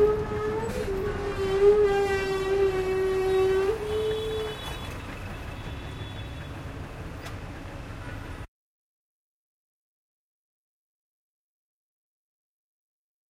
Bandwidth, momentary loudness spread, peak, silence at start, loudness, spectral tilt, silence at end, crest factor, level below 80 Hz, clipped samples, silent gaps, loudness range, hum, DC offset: 15 kHz; 17 LU; -10 dBFS; 0 s; -27 LUFS; -6 dB/octave; 4.85 s; 20 dB; -44 dBFS; under 0.1%; none; 19 LU; none; under 0.1%